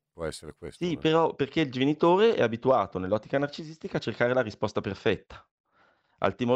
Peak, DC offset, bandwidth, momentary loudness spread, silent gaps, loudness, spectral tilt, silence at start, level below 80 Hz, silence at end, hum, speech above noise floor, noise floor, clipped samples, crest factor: -8 dBFS; under 0.1%; 11 kHz; 13 LU; 5.51-5.64 s; -27 LUFS; -6.5 dB/octave; 0.2 s; -58 dBFS; 0 s; none; 39 dB; -66 dBFS; under 0.1%; 20 dB